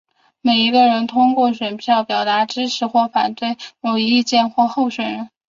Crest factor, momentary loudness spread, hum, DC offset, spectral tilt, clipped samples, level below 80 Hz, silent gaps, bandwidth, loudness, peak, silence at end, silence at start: 16 dB; 9 LU; none; under 0.1%; -4 dB/octave; under 0.1%; -64 dBFS; none; 7.6 kHz; -17 LUFS; -2 dBFS; 0.2 s; 0.45 s